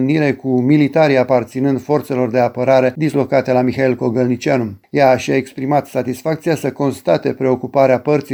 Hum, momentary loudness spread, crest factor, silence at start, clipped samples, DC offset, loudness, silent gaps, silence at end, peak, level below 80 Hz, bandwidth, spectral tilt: none; 6 LU; 14 dB; 0 s; under 0.1%; under 0.1%; -16 LUFS; none; 0 s; -2 dBFS; -56 dBFS; over 20 kHz; -7 dB/octave